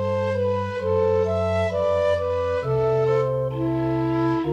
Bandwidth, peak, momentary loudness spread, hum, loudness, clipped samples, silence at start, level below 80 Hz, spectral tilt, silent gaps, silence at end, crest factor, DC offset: 9 kHz; -10 dBFS; 4 LU; none; -22 LUFS; under 0.1%; 0 s; -48 dBFS; -8 dB/octave; none; 0 s; 12 dB; under 0.1%